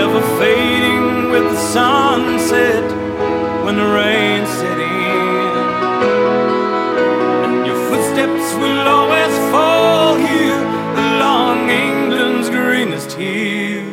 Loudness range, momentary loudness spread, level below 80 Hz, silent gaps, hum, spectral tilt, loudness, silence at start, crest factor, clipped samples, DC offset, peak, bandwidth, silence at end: 2 LU; 6 LU; -48 dBFS; none; none; -4.5 dB/octave; -14 LUFS; 0 s; 14 dB; under 0.1%; under 0.1%; 0 dBFS; 16.5 kHz; 0 s